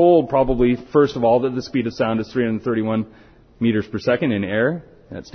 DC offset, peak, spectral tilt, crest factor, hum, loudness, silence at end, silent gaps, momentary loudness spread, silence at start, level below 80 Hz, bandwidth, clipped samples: under 0.1%; -4 dBFS; -7.5 dB/octave; 16 dB; none; -20 LUFS; 0.1 s; none; 8 LU; 0 s; -42 dBFS; 6.6 kHz; under 0.1%